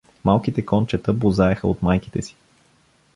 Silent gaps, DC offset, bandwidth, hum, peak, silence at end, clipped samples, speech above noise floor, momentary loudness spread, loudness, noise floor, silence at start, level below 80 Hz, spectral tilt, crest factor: none; under 0.1%; 11 kHz; none; -2 dBFS; 0.85 s; under 0.1%; 39 dB; 10 LU; -21 LUFS; -59 dBFS; 0.25 s; -40 dBFS; -8 dB/octave; 18 dB